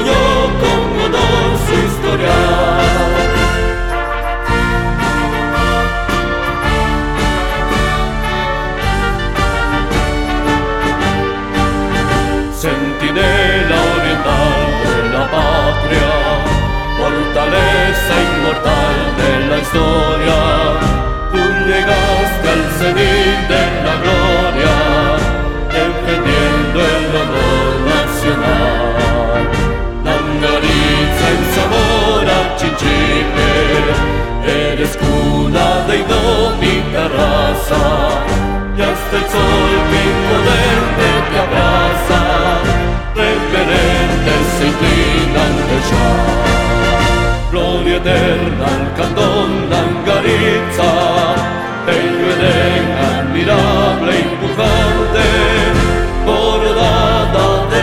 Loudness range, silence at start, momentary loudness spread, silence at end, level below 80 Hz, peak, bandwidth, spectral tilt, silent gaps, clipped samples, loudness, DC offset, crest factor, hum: 3 LU; 0 s; 4 LU; 0 s; -20 dBFS; 0 dBFS; 16.5 kHz; -5 dB/octave; none; under 0.1%; -13 LUFS; 0.6%; 12 dB; none